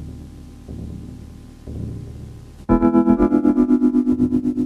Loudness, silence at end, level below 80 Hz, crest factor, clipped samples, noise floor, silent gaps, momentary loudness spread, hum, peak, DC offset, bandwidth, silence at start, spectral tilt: -17 LUFS; 0 s; -36 dBFS; 16 dB; under 0.1%; -38 dBFS; none; 23 LU; none; -4 dBFS; under 0.1%; 4.8 kHz; 0 s; -9.5 dB/octave